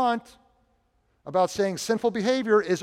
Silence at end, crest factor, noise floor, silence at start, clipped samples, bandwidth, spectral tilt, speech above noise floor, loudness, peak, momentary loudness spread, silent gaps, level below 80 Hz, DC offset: 0 s; 16 dB; -68 dBFS; 0 s; under 0.1%; 15.5 kHz; -4.5 dB/octave; 44 dB; -25 LUFS; -10 dBFS; 8 LU; none; -64 dBFS; under 0.1%